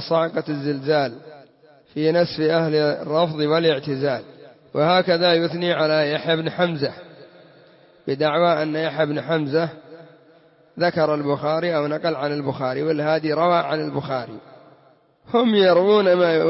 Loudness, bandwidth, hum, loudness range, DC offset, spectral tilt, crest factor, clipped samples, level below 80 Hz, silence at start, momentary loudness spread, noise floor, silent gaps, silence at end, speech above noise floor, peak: -20 LUFS; 5.8 kHz; none; 3 LU; under 0.1%; -9.5 dB/octave; 16 dB; under 0.1%; -66 dBFS; 0 s; 11 LU; -56 dBFS; none; 0 s; 36 dB; -6 dBFS